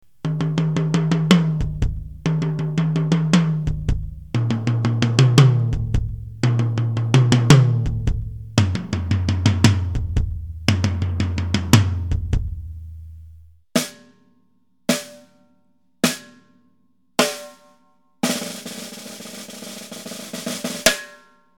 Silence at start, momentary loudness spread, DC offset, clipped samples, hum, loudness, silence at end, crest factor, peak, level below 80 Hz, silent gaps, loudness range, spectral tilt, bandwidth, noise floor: 0.25 s; 17 LU; 0.4%; under 0.1%; none; -20 LUFS; 0.45 s; 20 dB; 0 dBFS; -34 dBFS; none; 10 LU; -5.5 dB/octave; 18 kHz; -65 dBFS